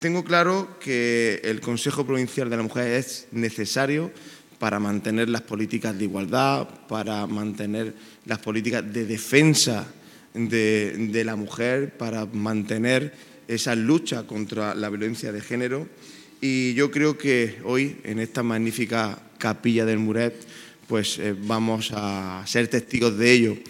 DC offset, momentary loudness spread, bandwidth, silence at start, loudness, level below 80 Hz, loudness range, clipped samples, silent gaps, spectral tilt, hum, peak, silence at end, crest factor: under 0.1%; 10 LU; 17 kHz; 0 s; -24 LUFS; -68 dBFS; 3 LU; under 0.1%; none; -4.5 dB/octave; none; -2 dBFS; 0 s; 24 dB